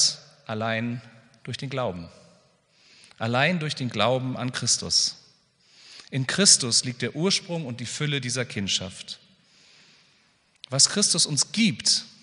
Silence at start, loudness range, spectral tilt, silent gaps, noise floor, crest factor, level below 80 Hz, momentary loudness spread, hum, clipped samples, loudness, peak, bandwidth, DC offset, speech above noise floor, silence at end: 0 s; 7 LU; -2.5 dB/octave; none; -64 dBFS; 24 dB; -66 dBFS; 18 LU; none; under 0.1%; -23 LUFS; -2 dBFS; 11 kHz; under 0.1%; 39 dB; 0.15 s